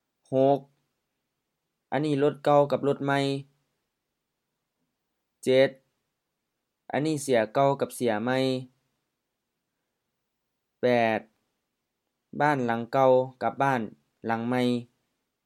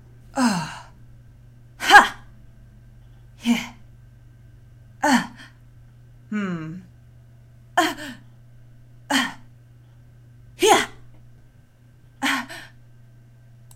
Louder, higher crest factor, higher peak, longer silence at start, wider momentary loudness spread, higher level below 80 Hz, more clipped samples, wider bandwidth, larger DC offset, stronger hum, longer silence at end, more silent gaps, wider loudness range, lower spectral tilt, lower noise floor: second, -26 LUFS vs -20 LUFS; second, 20 dB vs 26 dB; second, -8 dBFS vs 0 dBFS; about the same, 0.3 s vs 0.35 s; second, 10 LU vs 25 LU; second, -78 dBFS vs -52 dBFS; neither; second, 14 kHz vs 16 kHz; neither; neither; second, 0.6 s vs 1.1 s; neither; second, 5 LU vs 9 LU; first, -6 dB/octave vs -3 dB/octave; first, -83 dBFS vs -51 dBFS